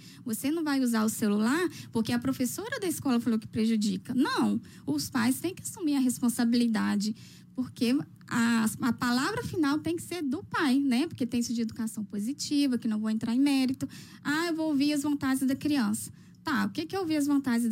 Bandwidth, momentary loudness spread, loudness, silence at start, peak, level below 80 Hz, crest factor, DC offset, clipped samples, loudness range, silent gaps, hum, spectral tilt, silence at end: 16 kHz; 8 LU; -29 LUFS; 0 s; -16 dBFS; -66 dBFS; 12 dB; under 0.1%; under 0.1%; 1 LU; none; none; -4.5 dB/octave; 0 s